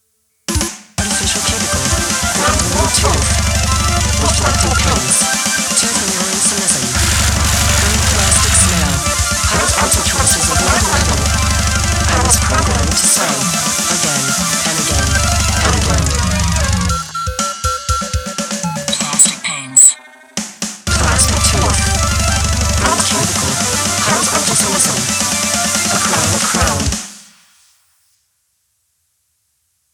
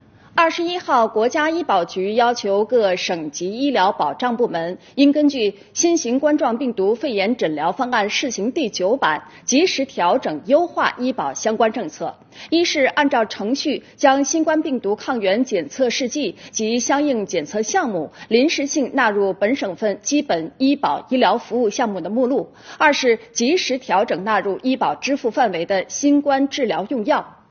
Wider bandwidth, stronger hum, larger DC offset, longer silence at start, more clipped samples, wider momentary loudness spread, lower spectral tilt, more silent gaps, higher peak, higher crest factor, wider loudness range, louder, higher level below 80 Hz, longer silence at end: first, over 20 kHz vs 7 kHz; neither; neither; first, 0.5 s vs 0.35 s; neither; about the same, 8 LU vs 6 LU; about the same, -2.5 dB/octave vs -2.5 dB/octave; neither; about the same, 0 dBFS vs 0 dBFS; about the same, 14 dB vs 18 dB; first, 4 LU vs 1 LU; first, -13 LUFS vs -19 LUFS; first, -22 dBFS vs -64 dBFS; first, 2.75 s vs 0.2 s